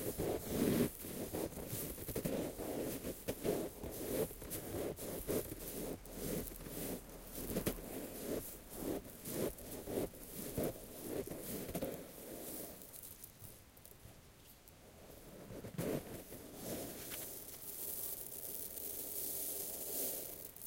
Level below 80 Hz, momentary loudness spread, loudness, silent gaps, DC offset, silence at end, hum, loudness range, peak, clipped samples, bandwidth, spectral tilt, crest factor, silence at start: -58 dBFS; 13 LU; -43 LUFS; none; under 0.1%; 0 s; none; 8 LU; -22 dBFS; under 0.1%; 17 kHz; -4.5 dB/octave; 22 dB; 0 s